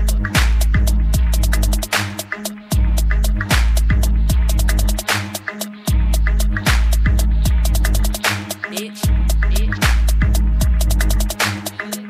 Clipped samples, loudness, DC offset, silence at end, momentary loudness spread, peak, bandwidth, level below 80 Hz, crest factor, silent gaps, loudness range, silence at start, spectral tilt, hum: under 0.1%; -18 LUFS; under 0.1%; 0 s; 8 LU; -2 dBFS; 16 kHz; -16 dBFS; 12 dB; none; 0 LU; 0 s; -4.5 dB/octave; none